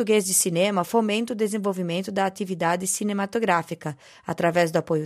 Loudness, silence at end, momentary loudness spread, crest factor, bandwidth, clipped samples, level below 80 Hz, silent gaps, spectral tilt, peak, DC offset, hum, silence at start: -24 LUFS; 0 s; 10 LU; 16 dB; 15.5 kHz; under 0.1%; -70 dBFS; none; -4 dB/octave; -6 dBFS; under 0.1%; none; 0 s